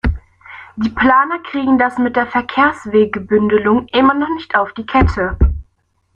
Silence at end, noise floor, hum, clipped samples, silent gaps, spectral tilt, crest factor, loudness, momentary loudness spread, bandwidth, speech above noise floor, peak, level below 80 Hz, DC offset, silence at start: 0.55 s; -60 dBFS; none; under 0.1%; none; -8 dB/octave; 14 dB; -15 LUFS; 9 LU; 8.4 kHz; 46 dB; 0 dBFS; -26 dBFS; under 0.1%; 0.05 s